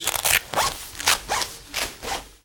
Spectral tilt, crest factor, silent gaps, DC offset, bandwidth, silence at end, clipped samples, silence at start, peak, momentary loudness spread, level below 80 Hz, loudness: 0 dB/octave; 20 dB; none; under 0.1%; over 20 kHz; 0.1 s; under 0.1%; 0 s; -6 dBFS; 8 LU; -46 dBFS; -23 LUFS